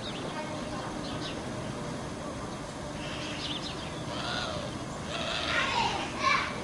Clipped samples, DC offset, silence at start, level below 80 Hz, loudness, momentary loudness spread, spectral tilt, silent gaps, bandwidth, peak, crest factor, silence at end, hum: under 0.1%; under 0.1%; 0 s; -52 dBFS; -33 LUFS; 10 LU; -3.5 dB/octave; none; 11.5 kHz; -14 dBFS; 20 dB; 0 s; none